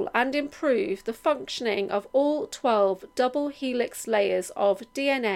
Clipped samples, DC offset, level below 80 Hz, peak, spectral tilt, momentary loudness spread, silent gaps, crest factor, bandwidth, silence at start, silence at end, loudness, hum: under 0.1%; under 0.1%; -64 dBFS; -8 dBFS; -4 dB/octave; 4 LU; none; 18 dB; 16 kHz; 0 s; 0 s; -26 LUFS; none